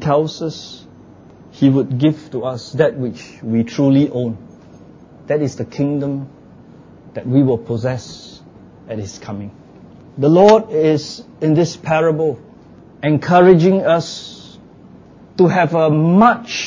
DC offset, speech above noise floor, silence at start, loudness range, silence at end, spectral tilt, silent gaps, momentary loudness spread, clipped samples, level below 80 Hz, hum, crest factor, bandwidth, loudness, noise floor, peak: under 0.1%; 27 dB; 0 s; 7 LU; 0 s; -7 dB/octave; none; 20 LU; under 0.1%; -52 dBFS; none; 16 dB; 7.6 kHz; -15 LUFS; -42 dBFS; 0 dBFS